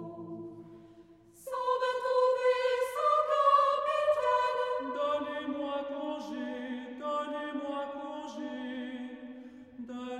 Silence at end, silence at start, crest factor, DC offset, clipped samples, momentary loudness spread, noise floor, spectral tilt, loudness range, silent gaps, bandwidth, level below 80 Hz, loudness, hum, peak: 0 s; 0 s; 18 dB; under 0.1%; under 0.1%; 17 LU; -56 dBFS; -4 dB/octave; 10 LU; none; 14 kHz; -74 dBFS; -31 LUFS; none; -14 dBFS